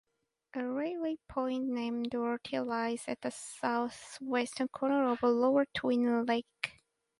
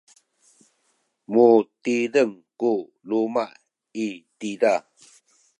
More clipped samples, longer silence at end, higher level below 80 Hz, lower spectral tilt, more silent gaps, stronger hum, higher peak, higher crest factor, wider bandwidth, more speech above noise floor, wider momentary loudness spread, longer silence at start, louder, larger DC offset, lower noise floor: neither; second, 0.5 s vs 0.8 s; first, -70 dBFS vs -80 dBFS; about the same, -4.5 dB/octave vs -5.5 dB/octave; neither; neither; second, -12 dBFS vs -4 dBFS; about the same, 22 dB vs 20 dB; about the same, 11.5 kHz vs 10.5 kHz; second, 31 dB vs 49 dB; second, 11 LU vs 15 LU; second, 0.55 s vs 1.3 s; second, -33 LUFS vs -23 LUFS; neither; second, -64 dBFS vs -70 dBFS